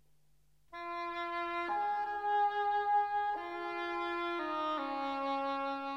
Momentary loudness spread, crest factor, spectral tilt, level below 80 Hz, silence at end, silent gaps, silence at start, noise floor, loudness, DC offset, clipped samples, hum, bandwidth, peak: 8 LU; 12 dB; -4 dB/octave; -72 dBFS; 0 s; none; 0.7 s; -73 dBFS; -35 LUFS; under 0.1%; under 0.1%; none; 7.6 kHz; -22 dBFS